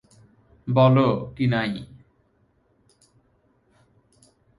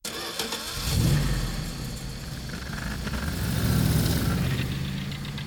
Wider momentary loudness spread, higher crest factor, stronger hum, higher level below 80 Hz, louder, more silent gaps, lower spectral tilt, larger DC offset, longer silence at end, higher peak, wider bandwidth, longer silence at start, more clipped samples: first, 20 LU vs 11 LU; about the same, 20 dB vs 16 dB; neither; second, -56 dBFS vs -34 dBFS; first, -21 LUFS vs -28 LUFS; neither; first, -9 dB/octave vs -5 dB/octave; neither; first, 2.75 s vs 0 s; first, -6 dBFS vs -12 dBFS; second, 11 kHz vs over 20 kHz; first, 0.65 s vs 0.05 s; neither